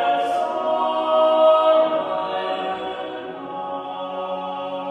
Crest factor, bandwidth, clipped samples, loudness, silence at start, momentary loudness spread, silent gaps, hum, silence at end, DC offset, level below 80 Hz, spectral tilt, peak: 16 dB; 9.6 kHz; under 0.1%; -21 LUFS; 0 s; 15 LU; none; none; 0 s; under 0.1%; -68 dBFS; -5 dB/octave; -6 dBFS